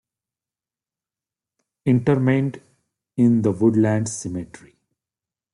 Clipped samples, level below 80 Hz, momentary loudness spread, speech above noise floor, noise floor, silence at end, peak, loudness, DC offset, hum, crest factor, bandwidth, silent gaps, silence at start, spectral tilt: under 0.1%; -60 dBFS; 14 LU; over 71 dB; under -90 dBFS; 1.1 s; -6 dBFS; -20 LUFS; under 0.1%; none; 18 dB; 11.5 kHz; none; 1.85 s; -7.5 dB/octave